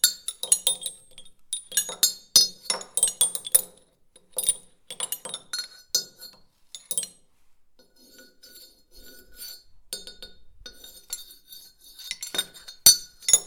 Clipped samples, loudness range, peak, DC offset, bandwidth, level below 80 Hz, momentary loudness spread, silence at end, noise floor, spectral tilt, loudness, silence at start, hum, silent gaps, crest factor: under 0.1%; 20 LU; 0 dBFS; under 0.1%; 19 kHz; -62 dBFS; 25 LU; 0 s; -58 dBFS; 2 dB/octave; -23 LUFS; 0.05 s; none; none; 28 dB